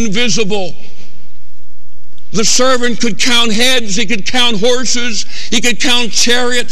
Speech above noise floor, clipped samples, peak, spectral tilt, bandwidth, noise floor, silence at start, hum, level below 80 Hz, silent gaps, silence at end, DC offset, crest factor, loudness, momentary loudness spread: 26 dB; under 0.1%; 0 dBFS; -2 dB/octave; 14.5 kHz; -40 dBFS; 0 s; none; -44 dBFS; none; 0 s; 40%; 16 dB; -12 LUFS; 7 LU